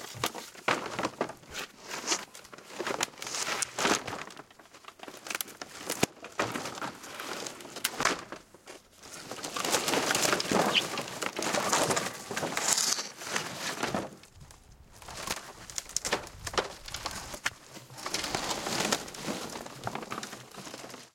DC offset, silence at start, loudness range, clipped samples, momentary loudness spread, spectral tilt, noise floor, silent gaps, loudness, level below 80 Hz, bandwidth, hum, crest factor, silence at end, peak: under 0.1%; 0 s; 8 LU; under 0.1%; 19 LU; -1.5 dB/octave; -54 dBFS; none; -32 LUFS; -62 dBFS; 17 kHz; none; 30 dB; 0.05 s; -4 dBFS